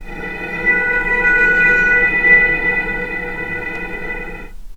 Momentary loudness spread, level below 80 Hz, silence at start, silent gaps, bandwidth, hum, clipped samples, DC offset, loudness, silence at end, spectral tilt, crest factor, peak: 16 LU; -32 dBFS; 0 s; none; 14.5 kHz; none; under 0.1%; under 0.1%; -13 LUFS; 0 s; -5.5 dB/octave; 16 dB; 0 dBFS